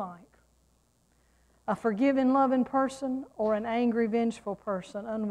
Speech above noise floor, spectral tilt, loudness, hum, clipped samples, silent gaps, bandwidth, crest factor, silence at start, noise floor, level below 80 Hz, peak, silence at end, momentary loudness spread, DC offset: 40 dB; -6.5 dB/octave; -29 LUFS; none; under 0.1%; none; 10.5 kHz; 14 dB; 0 s; -68 dBFS; -66 dBFS; -14 dBFS; 0 s; 11 LU; under 0.1%